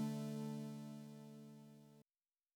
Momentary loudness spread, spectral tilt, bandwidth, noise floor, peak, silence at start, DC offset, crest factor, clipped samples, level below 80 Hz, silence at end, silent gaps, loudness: 18 LU; -7 dB/octave; over 20 kHz; under -90 dBFS; -34 dBFS; 0 s; under 0.1%; 16 dB; under 0.1%; under -90 dBFS; 0.55 s; none; -50 LUFS